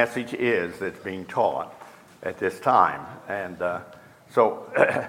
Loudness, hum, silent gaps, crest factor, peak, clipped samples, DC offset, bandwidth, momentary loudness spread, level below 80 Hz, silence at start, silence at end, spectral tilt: -25 LUFS; none; none; 22 dB; -2 dBFS; under 0.1%; under 0.1%; 16.5 kHz; 15 LU; -66 dBFS; 0 s; 0 s; -5.5 dB/octave